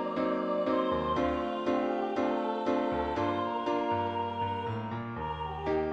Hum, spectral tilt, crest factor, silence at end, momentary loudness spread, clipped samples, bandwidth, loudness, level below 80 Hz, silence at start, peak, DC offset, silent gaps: none; -7.5 dB/octave; 14 dB; 0 s; 6 LU; under 0.1%; 8.2 kHz; -31 LUFS; -52 dBFS; 0 s; -16 dBFS; under 0.1%; none